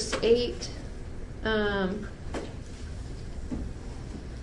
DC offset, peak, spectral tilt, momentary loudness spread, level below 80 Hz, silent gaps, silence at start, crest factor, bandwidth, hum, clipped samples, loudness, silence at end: under 0.1%; -12 dBFS; -5 dB/octave; 16 LU; -40 dBFS; none; 0 s; 20 dB; 11.5 kHz; none; under 0.1%; -32 LUFS; 0 s